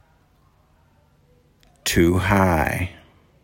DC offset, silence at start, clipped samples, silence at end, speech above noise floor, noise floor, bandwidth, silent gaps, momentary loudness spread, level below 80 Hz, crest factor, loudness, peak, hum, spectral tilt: under 0.1%; 1.85 s; under 0.1%; 0.5 s; 40 dB; -58 dBFS; 16.5 kHz; none; 10 LU; -40 dBFS; 20 dB; -20 LUFS; -4 dBFS; none; -5.5 dB/octave